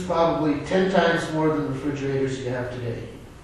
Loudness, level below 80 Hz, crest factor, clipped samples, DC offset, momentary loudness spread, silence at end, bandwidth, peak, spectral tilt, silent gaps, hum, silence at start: -24 LUFS; -48 dBFS; 18 dB; under 0.1%; under 0.1%; 11 LU; 0 s; 12 kHz; -6 dBFS; -6.5 dB/octave; none; none; 0 s